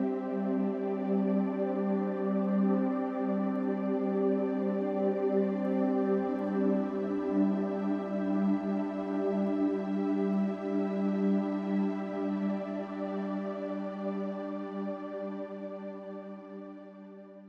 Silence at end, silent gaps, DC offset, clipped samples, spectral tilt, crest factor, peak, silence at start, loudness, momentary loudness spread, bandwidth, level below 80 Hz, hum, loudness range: 0 s; none; under 0.1%; under 0.1%; -10 dB/octave; 14 dB; -16 dBFS; 0 s; -32 LUFS; 10 LU; 5.6 kHz; -74 dBFS; none; 7 LU